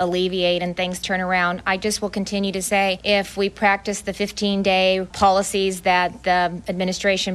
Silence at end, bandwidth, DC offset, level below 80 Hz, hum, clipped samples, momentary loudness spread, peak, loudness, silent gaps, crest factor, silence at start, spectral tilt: 0 s; 13.5 kHz; under 0.1%; -48 dBFS; none; under 0.1%; 6 LU; -4 dBFS; -20 LUFS; none; 16 dB; 0 s; -3.5 dB/octave